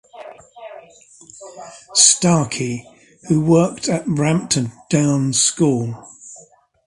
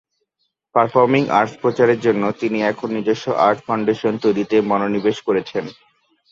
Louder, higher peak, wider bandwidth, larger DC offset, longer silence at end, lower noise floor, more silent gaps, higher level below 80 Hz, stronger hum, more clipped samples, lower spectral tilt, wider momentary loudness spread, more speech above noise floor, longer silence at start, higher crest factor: about the same, -16 LUFS vs -18 LUFS; about the same, 0 dBFS vs -2 dBFS; first, 11.5 kHz vs 7.6 kHz; neither; about the same, 0.5 s vs 0.6 s; second, -48 dBFS vs -72 dBFS; neither; first, -52 dBFS vs -60 dBFS; neither; neither; second, -4 dB/octave vs -6.5 dB/octave; first, 26 LU vs 6 LU; second, 31 dB vs 54 dB; second, 0.15 s vs 0.75 s; about the same, 20 dB vs 16 dB